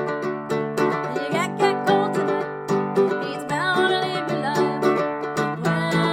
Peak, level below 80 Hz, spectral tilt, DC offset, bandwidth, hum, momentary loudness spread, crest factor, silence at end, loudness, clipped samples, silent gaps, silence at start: -4 dBFS; -62 dBFS; -5.5 dB/octave; under 0.1%; 16 kHz; none; 6 LU; 18 dB; 0 s; -22 LUFS; under 0.1%; none; 0 s